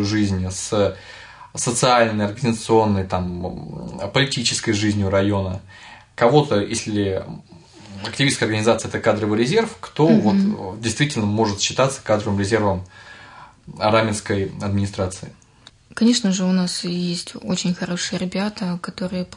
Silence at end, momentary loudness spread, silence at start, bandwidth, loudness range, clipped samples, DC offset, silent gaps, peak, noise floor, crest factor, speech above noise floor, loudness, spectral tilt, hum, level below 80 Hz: 0 s; 16 LU; 0 s; 11 kHz; 3 LU; under 0.1%; under 0.1%; none; -2 dBFS; -50 dBFS; 18 dB; 30 dB; -20 LUFS; -5 dB/octave; none; -54 dBFS